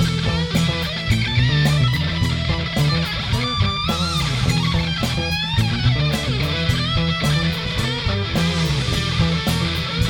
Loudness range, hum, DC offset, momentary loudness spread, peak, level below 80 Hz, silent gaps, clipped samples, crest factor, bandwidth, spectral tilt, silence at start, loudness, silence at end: 1 LU; none; under 0.1%; 3 LU; -6 dBFS; -30 dBFS; none; under 0.1%; 14 dB; 18.5 kHz; -5 dB/octave; 0 s; -19 LUFS; 0 s